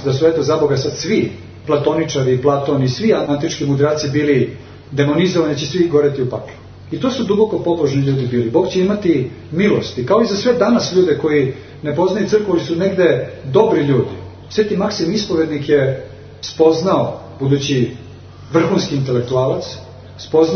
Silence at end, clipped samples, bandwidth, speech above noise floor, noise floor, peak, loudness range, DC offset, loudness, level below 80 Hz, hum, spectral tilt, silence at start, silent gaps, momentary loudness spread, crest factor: 0 s; under 0.1%; 6.6 kHz; 20 dB; -35 dBFS; 0 dBFS; 2 LU; under 0.1%; -16 LUFS; -48 dBFS; none; -6.5 dB/octave; 0 s; none; 9 LU; 16 dB